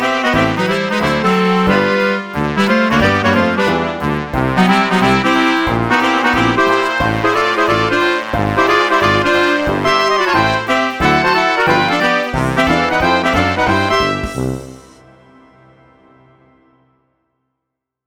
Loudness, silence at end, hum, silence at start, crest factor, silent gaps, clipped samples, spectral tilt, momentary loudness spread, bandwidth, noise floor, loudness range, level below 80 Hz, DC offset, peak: -13 LUFS; 3.25 s; none; 0 s; 14 dB; none; under 0.1%; -5.5 dB/octave; 4 LU; 19.5 kHz; -78 dBFS; 4 LU; -36 dBFS; under 0.1%; 0 dBFS